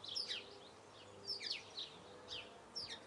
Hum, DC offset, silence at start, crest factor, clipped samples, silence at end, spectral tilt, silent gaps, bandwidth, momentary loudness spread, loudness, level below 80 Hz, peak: none; under 0.1%; 0 s; 22 dB; under 0.1%; 0 s; -1.5 dB/octave; none; 12 kHz; 16 LU; -46 LUFS; -80 dBFS; -28 dBFS